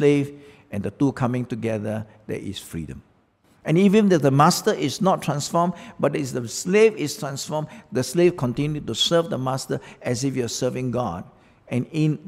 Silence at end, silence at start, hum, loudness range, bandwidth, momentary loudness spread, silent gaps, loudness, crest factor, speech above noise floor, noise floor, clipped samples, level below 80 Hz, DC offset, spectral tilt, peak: 0 s; 0 s; none; 5 LU; 16 kHz; 15 LU; none; -23 LUFS; 20 dB; 38 dB; -60 dBFS; under 0.1%; -54 dBFS; under 0.1%; -5.5 dB/octave; -4 dBFS